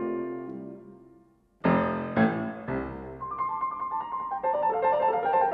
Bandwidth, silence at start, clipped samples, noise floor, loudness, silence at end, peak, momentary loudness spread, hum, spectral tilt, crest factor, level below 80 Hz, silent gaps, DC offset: 5.2 kHz; 0 s; under 0.1%; -60 dBFS; -28 LUFS; 0 s; -12 dBFS; 13 LU; none; -10 dB/octave; 18 dB; -56 dBFS; none; under 0.1%